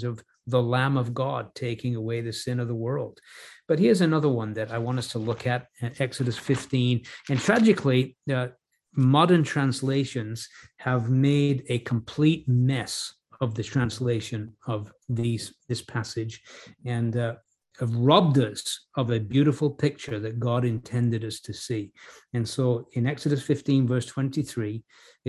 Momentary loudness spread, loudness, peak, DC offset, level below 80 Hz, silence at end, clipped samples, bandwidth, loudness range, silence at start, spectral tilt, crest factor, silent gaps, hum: 13 LU; -26 LUFS; -4 dBFS; under 0.1%; -58 dBFS; 0 s; under 0.1%; 12.5 kHz; 6 LU; 0 s; -6.5 dB/octave; 20 dB; none; none